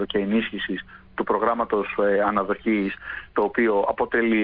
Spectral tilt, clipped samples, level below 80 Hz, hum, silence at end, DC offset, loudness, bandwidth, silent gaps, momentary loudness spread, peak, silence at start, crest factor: -9.5 dB/octave; under 0.1%; -52 dBFS; none; 0 s; under 0.1%; -23 LUFS; 5 kHz; none; 9 LU; -8 dBFS; 0 s; 16 dB